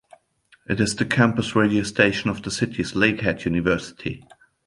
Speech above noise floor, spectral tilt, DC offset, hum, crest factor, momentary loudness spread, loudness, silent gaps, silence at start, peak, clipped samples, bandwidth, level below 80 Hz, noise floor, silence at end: 38 dB; -5 dB/octave; under 0.1%; none; 22 dB; 10 LU; -22 LUFS; none; 0.7 s; -2 dBFS; under 0.1%; 11.5 kHz; -48 dBFS; -59 dBFS; 0.5 s